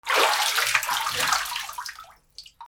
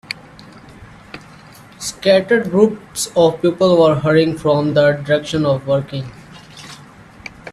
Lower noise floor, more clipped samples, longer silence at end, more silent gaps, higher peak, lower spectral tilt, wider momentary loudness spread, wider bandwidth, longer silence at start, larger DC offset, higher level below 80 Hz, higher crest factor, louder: first, -49 dBFS vs -41 dBFS; neither; about the same, 0.05 s vs 0 s; neither; second, -4 dBFS vs 0 dBFS; second, 1 dB/octave vs -5.5 dB/octave; second, 16 LU vs 23 LU; first, over 20 kHz vs 13.5 kHz; about the same, 0.05 s vs 0.1 s; neither; second, -60 dBFS vs -50 dBFS; about the same, 22 dB vs 18 dB; second, -23 LUFS vs -15 LUFS